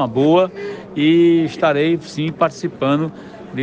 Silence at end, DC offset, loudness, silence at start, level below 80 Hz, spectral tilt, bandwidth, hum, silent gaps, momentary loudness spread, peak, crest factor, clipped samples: 0 s; under 0.1%; -17 LUFS; 0 s; -58 dBFS; -7 dB/octave; 8 kHz; none; none; 14 LU; -4 dBFS; 14 dB; under 0.1%